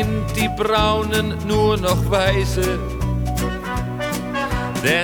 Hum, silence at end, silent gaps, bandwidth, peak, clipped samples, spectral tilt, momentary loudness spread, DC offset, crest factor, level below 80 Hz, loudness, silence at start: none; 0 s; none; over 20 kHz; -2 dBFS; under 0.1%; -5 dB/octave; 6 LU; under 0.1%; 16 dB; -28 dBFS; -20 LUFS; 0 s